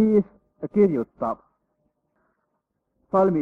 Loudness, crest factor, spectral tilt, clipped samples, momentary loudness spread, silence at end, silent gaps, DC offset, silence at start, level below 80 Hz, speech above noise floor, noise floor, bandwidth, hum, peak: -23 LUFS; 16 dB; -11 dB/octave; under 0.1%; 16 LU; 0 s; none; under 0.1%; 0 s; -60 dBFS; 56 dB; -76 dBFS; 3 kHz; none; -8 dBFS